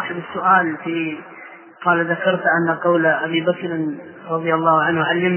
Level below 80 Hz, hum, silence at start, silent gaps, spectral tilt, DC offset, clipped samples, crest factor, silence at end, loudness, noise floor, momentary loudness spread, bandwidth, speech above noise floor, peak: -66 dBFS; none; 0 s; none; -9.5 dB/octave; under 0.1%; under 0.1%; 18 dB; 0 s; -18 LUFS; -38 dBFS; 11 LU; 3.2 kHz; 20 dB; -2 dBFS